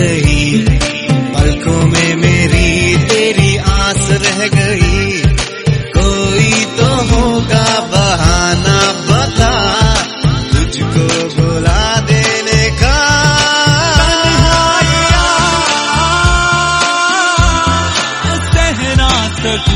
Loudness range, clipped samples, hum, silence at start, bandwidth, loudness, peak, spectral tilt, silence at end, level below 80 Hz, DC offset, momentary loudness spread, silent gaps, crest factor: 2 LU; 0.3%; none; 0 s; 11 kHz; -10 LUFS; 0 dBFS; -4 dB/octave; 0 s; -18 dBFS; under 0.1%; 4 LU; none; 10 dB